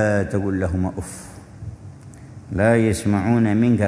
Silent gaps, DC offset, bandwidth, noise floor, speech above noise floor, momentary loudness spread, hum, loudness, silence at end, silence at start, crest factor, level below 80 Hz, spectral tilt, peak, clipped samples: none; under 0.1%; 11 kHz; -40 dBFS; 21 dB; 23 LU; none; -20 LUFS; 0 s; 0 s; 18 dB; -42 dBFS; -7 dB/octave; -4 dBFS; under 0.1%